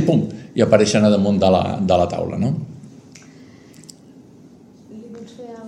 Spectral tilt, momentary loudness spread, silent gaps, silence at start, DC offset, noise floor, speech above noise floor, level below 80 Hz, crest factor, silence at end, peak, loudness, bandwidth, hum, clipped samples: -6.5 dB/octave; 23 LU; none; 0 s; under 0.1%; -45 dBFS; 29 dB; -52 dBFS; 20 dB; 0 s; 0 dBFS; -17 LUFS; 11 kHz; none; under 0.1%